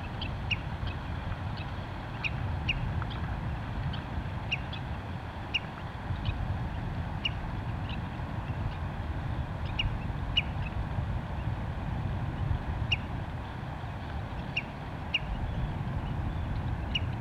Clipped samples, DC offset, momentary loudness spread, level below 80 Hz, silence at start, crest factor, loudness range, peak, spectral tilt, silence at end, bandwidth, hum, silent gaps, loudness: under 0.1%; under 0.1%; 6 LU; -40 dBFS; 0 s; 20 dB; 2 LU; -14 dBFS; -6.5 dB/octave; 0 s; 10 kHz; none; none; -35 LUFS